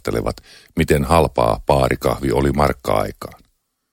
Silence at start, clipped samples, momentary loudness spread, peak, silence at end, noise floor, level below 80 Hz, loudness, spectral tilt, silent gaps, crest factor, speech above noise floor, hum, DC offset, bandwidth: 0.05 s; under 0.1%; 14 LU; 0 dBFS; 0.6 s; -64 dBFS; -32 dBFS; -18 LUFS; -6 dB/octave; none; 18 dB; 46 dB; none; under 0.1%; 17 kHz